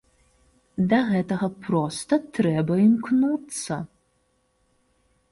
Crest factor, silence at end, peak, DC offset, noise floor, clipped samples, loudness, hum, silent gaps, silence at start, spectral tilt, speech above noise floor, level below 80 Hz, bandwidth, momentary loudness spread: 16 dB; 1.45 s; -10 dBFS; under 0.1%; -68 dBFS; under 0.1%; -23 LUFS; none; none; 0.8 s; -6.5 dB/octave; 46 dB; -60 dBFS; 11.5 kHz; 11 LU